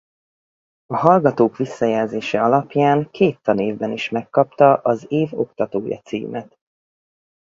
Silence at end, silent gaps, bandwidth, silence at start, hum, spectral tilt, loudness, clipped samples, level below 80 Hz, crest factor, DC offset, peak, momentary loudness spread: 0.95 s; none; 7.6 kHz; 0.9 s; none; -7.5 dB/octave; -19 LUFS; under 0.1%; -60 dBFS; 20 dB; under 0.1%; 0 dBFS; 12 LU